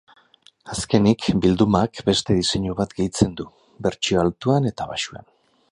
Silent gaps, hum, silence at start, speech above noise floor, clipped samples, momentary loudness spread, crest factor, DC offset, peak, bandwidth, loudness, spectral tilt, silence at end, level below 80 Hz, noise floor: none; none; 0.65 s; 35 dB; under 0.1%; 11 LU; 20 dB; under 0.1%; -2 dBFS; 11 kHz; -21 LUFS; -5.5 dB/octave; 0.55 s; -44 dBFS; -55 dBFS